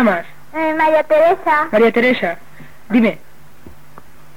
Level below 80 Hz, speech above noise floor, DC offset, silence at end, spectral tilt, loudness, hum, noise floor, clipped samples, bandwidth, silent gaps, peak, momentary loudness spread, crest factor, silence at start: -54 dBFS; 30 dB; 2%; 0.7 s; -6.5 dB/octave; -15 LUFS; none; -44 dBFS; under 0.1%; 16.5 kHz; none; -2 dBFS; 11 LU; 14 dB; 0 s